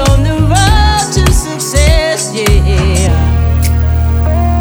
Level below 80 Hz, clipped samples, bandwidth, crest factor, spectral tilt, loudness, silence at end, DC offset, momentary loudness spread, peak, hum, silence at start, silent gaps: -12 dBFS; 0.2%; over 20 kHz; 8 dB; -5 dB/octave; -11 LUFS; 0 s; 0.6%; 3 LU; 0 dBFS; none; 0 s; none